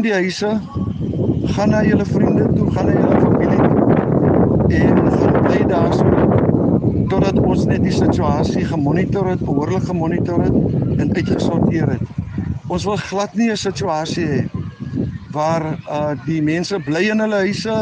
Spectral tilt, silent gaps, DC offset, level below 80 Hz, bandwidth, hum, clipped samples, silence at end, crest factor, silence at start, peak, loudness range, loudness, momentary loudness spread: -7.5 dB/octave; none; under 0.1%; -34 dBFS; 9.4 kHz; none; under 0.1%; 0 s; 14 dB; 0 s; -2 dBFS; 6 LU; -17 LUFS; 8 LU